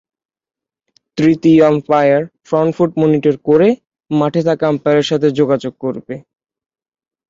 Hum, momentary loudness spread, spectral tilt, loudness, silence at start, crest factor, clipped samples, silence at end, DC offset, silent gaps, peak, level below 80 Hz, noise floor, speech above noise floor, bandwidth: none; 13 LU; -7.5 dB/octave; -14 LUFS; 1.15 s; 14 dB; under 0.1%; 1.1 s; under 0.1%; none; 0 dBFS; -56 dBFS; -61 dBFS; 47 dB; 7.6 kHz